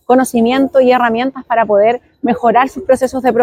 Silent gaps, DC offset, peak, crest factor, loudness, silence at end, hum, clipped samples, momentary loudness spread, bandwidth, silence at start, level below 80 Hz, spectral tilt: none; under 0.1%; 0 dBFS; 12 dB; -13 LUFS; 0 s; none; under 0.1%; 5 LU; 15.5 kHz; 0.1 s; -48 dBFS; -5 dB/octave